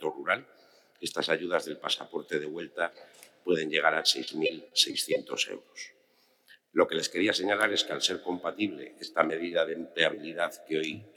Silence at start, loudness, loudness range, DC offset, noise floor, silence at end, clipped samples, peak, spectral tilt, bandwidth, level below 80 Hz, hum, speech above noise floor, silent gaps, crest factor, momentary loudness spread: 0 s; -29 LUFS; 3 LU; under 0.1%; -67 dBFS; 0.05 s; under 0.1%; -6 dBFS; -2 dB/octave; 19 kHz; -82 dBFS; none; 37 dB; none; 24 dB; 9 LU